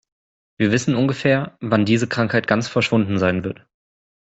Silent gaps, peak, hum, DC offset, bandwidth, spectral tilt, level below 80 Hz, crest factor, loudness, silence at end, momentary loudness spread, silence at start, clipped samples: none; -2 dBFS; none; under 0.1%; 8.2 kHz; -6 dB/octave; -56 dBFS; 18 dB; -19 LUFS; 0.65 s; 5 LU; 0.6 s; under 0.1%